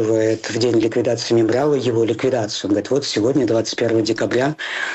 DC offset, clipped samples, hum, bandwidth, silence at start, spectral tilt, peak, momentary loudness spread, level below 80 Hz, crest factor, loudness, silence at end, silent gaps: under 0.1%; under 0.1%; none; 8.4 kHz; 0 s; -5 dB/octave; -8 dBFS; 3 LU; -58 dBFS; 10 dB; -18 LUFS; 0 s; none